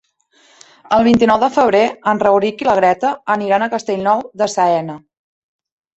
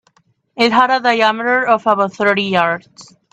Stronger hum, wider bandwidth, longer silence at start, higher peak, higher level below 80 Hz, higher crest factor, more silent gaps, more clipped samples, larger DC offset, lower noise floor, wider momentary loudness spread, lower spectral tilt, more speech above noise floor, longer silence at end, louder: neither; second, 8.2 kHz vs 11 kHz; first, 0.9 s vs 0.55 s; about the same, -2 dBFS vs 0 dBFS; first, -52 dBFS vs -62 dBFS; about the same, 14 dB vs 16 dB; neither; neither; neither; second, -54 dBFS vs -58 dBFS; about the same, 7 LU vs 5 LU; about the same, -5 dB/octave vs -4.5 dB/octave; about the same, 40 dB vs 43 dB; first, 1 s vs 0.3 s; about the same, -15 LUFS vs -14 LUFS